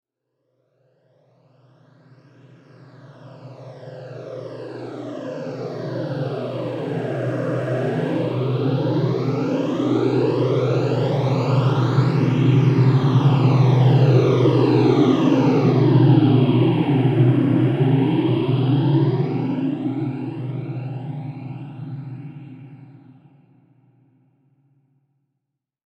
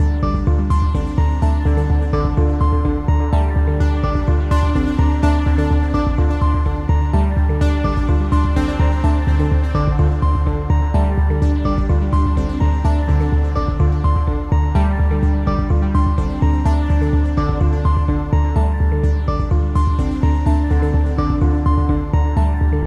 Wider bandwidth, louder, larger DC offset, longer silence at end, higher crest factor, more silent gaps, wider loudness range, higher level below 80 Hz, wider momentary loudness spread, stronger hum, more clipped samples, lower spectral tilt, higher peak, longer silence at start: about the same, 6.6 kHz vs 7 kHz; about the same, -19 LUFS vs -17 LUFS; neither; first, 3.05 s vs 0 s; about the same, 16 dB vs 12 dB; neither; first, 19 LU vs 0 LU; second, -64 dBFS vs -18 dBFS; first, 18 LU vs 2 LU; neither; neither; about the same, -9 dB/octave vs -9 dB/octave; about the same, -4 dBFS vs -2 dBFS; first, 3.05 s vs 0 s